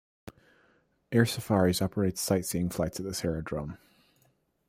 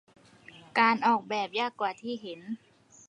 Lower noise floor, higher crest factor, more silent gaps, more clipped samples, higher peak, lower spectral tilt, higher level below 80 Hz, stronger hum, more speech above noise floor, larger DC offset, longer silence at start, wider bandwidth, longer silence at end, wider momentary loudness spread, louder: first, -70 dBFS vs -54 dBFS; about the same, 22 dB vs 22 dB; neither; neither; about the same, -10 dBFS vs -8 dBFS; first, -5.5 dB/octave vs -4 dB/octave; first, -56 dBFS vs -80 dBFS; neither; first, 41 dB vs 25 dB; neither; second, 0.25 s vs 0.55 s; first, 16 kHz vs 10.5 kHz; first, 0.95 s vs 0.55 s; second, 10 LU vs 17 LU; about the same, -29 LUFS vs -28 LUFS